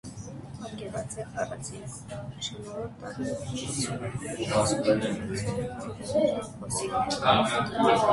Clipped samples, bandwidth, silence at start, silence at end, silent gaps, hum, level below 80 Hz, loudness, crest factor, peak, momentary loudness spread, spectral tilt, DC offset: under 0.1%; 12 kHz; 0.05 s; 0 s; none; none; -52 dBFS; -29 LUFS; 20 dB; -8 dBFS; 15 LU; -4.5 dB/octave; under 0.1%